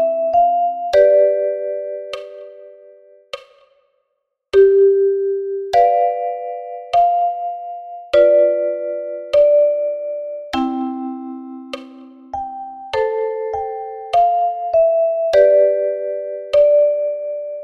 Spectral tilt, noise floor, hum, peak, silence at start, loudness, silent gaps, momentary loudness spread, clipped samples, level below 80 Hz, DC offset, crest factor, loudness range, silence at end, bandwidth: -5 dB/octave; -73 dBFS; none; -2 dBFS; 0 s; -16 LUFS; none; 18 LU; under 0.1%; -54 dBFS; under 0.1%; 16 dB; 9 LU; 0 s; 6.8 kHz